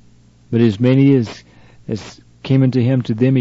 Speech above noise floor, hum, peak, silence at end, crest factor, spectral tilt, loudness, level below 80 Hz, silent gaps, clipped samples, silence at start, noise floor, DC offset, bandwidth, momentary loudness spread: 34 dB; none; -2 dBFS; 0 s; 14 dB; -8.5 dB/octave; -15 LUFS; -54 dBFS; none; under 0.1%; 0.5 s; -48 dBFS; under 0.1%; 7.6 kHz; 15 LU